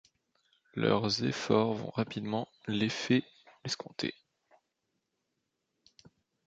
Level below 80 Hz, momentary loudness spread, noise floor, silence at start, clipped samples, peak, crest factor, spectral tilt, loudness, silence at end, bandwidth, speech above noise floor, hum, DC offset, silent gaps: -70 dBFS; 9 LU; -83 dBFS; 0.75 s; under 0.1%; -12 dBFS; 24 dB; -5.5 dB/octave; -32 LUFS; 2.35 s; 9 kHz; 52 dB; none; under 0.1%; none